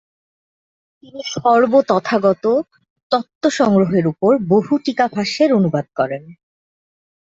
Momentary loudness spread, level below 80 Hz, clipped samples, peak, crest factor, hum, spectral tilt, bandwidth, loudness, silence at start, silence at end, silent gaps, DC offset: 8 LU; -60 dBFS; under 0.1%; -2 dBFS; 16 dB; none; -6 dB/octave; 7.8 kHz; -16 LUFS; 1.15 s; 0.9 s; 2.90-2.96 s, 3.03-3.10 s, 3.35-3.41 s; under 0.1%